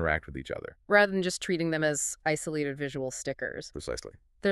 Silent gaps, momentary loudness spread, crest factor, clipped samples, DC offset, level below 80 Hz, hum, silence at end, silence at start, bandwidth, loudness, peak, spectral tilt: none; 15 LU; 22 dB; under 0.1%; under 0.1%; -52 dBFS; none; 0 s; 0 s; 13.5 kHz; -30 LUFS; -8 dBFS; -4 dB/octave